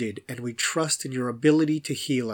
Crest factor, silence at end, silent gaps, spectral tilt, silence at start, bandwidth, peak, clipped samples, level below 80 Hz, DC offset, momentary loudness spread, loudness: 18 dB; 0 s; none; -4 dB/octave; 0 s; 19 kHz; -8 dBFS; under 0.1%; -74 dBFS; under 0.1%; 11 LU; -25 LUFS